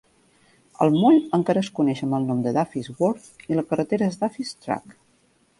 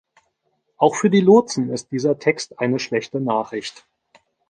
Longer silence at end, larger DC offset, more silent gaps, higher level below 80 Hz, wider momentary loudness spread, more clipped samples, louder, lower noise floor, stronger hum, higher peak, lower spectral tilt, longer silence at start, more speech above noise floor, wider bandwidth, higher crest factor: about the same, 0.7 s vs 0.8 s; neither; neither; about the same, -64 dBFS vs -66 dBFS; about the same, 12 LU vs 11 LU; neither; second, -23 LUFS vs -19 LUFS; second, -62 dBFS vs -70 dBFS; neither; about the same, -4 dBFS vs -2 dBFS; first, -7 dB/octave vs -5.5 dB/octave; about the same, 0.8 s vs 0.8 s; second, 40 dB vs 51 dB; first, 11.5 kHz vs 10 kHz; about the same, 20 dB vs 18 dB